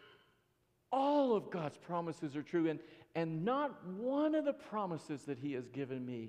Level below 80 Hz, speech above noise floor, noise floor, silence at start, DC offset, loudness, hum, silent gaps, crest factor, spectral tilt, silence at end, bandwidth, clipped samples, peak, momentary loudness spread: -84 dBFS; 39 dB; -77 dBFS; 0 s; under 0.1%; -38 LUFS; none; none; 16 dB; -7.5 dB/octave; 0 s; 10 kHz; under 0.1%; -22 dBFS; 10 LU